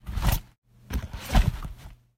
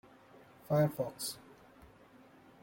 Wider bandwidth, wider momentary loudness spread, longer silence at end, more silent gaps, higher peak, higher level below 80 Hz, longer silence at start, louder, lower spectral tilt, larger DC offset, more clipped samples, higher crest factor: about the same, 16 kHz vs 17 kHz; second, 16 LU vs 19 LU; second, 0.25 s vs 1.25 s; first, 0.58-0.62 s vs none; first, -8 dBFS vs -18 dBFS; first, -30 dBFS vs -70 dBFS; second, 0.05 s vs 0.7 s; first, -29 LUFS vs -35 LUFS; about the same, -5 dB/octave vs -5.5 dB/octave; neither; neither; about the same, 20 dB vs 20 dB